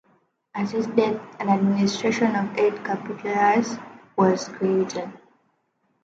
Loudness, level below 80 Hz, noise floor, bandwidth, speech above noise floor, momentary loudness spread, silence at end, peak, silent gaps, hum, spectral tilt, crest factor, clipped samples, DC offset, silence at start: -23 LUFS; -70 dBFS; -70 dBFS; 7.8 kHz; 48 dB; 11 LU; 0.9 s; -6 dBFS; none; none; -6 dB/octave; 18 dB; under 0.1%; under 0.1%; 0.55 s